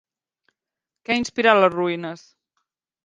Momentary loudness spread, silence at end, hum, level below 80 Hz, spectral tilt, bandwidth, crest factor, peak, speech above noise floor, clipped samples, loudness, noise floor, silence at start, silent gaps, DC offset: 21 LU; 0.9 s; none; -64 dBFS; -4.5 dB/octave; 9.8 kHz; 24 dB; 0 dBFS; 67 dB; under 0.1%; -20 LUFS; -87 dBFS; 1.1 s; none; under 0.1%